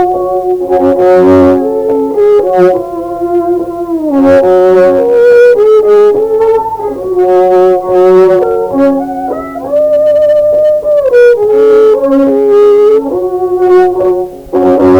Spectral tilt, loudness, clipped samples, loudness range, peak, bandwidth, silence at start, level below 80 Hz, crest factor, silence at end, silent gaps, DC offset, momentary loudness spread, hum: -7.5 dB/octave; -7 LUFS; 0.4%; 2 LU; 0 dBFS; 10.5 kHz; 0 s; -40 dBFS; 6 dB; 0 s; none; under 0.1%; 9 LU; none